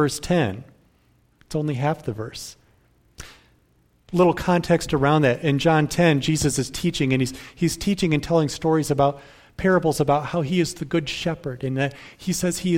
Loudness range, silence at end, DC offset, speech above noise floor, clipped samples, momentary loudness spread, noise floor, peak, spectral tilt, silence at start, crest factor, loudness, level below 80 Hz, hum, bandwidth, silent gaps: 8 LU; 0 s; under 0.1%; 40 dB; under 0.1%; 13 LU; -61 dBFS; -4 dBFS; -5.5 dB/octave; 0 s; 18 dB; -22 LUFS; -46 dBFS; none; 16.5 kHz; none